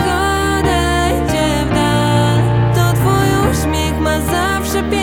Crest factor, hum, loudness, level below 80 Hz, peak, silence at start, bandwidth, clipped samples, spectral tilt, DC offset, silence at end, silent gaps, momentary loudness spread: 12 dB; none; -14 LUFS; -26 dBFS; -2 dBFS; 0 s; 17.5 kHz; under 0.1%; -5.5 dB/octave; under 0.1%; 0 s; none; 3 LU